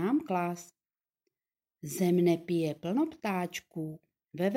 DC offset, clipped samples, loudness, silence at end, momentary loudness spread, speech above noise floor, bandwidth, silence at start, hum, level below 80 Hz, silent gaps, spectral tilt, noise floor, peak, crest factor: under 0.1%; under 0.1%; -32 LUFS; 0 s; 16 LU; over 59 dB; 16.5 kHz; 0 s; none; -76 dBFS; none; -6.5 dB/octave; under -90 dBFS; -16 dBFS; 16 dB